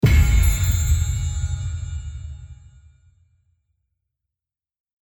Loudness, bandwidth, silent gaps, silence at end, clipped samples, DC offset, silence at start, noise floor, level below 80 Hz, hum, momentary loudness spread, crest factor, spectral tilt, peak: -22 LUFS; 18.5 kHz; none; 2.5 s; under 0.1%; under 0.1%; 0 s; -90 dBFS; -24 dBFS; none; 20 LU; 16 dB; -5 dB/octave; -6 dBFS